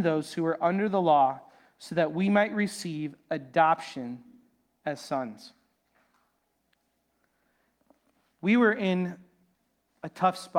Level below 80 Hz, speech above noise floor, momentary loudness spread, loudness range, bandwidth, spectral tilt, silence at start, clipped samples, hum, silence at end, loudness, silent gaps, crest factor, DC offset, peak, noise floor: -76 dBFS; 48 dB; 19 LU; 14 LU; 15.5 kHz; -6 dB/octave; 0 s; under 0.1%; none; 0 s; -27 LUFS; none; 20 dB; under 0.1%; -10 dBFS; -75 dBFS